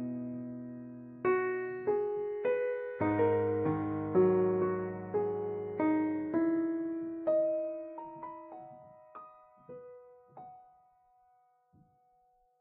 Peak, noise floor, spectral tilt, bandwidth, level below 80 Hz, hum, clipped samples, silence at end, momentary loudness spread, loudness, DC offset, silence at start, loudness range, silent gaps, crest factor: -16 dBFS; -70 dBFS; -8.5 dB/octave; 3.7 kHz; -70 dBFS; none; under 0.1%; 2 s; 23 LU; -33 LUFS; under 0.1%; 0 s; 16 LU; none; 18 dB